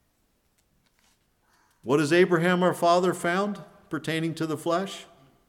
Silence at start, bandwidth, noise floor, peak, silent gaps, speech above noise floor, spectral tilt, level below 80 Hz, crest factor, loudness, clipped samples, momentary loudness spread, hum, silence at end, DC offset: 1.85 s; 16 kHz; -70 dBFS; -8 dBFS; none; 46 dB; -5.5 dB/octave; -72 dBFS; 18 dB; -25 LUFS; under 0.1%; 15 LU; none; 0.45 s; under 0.1%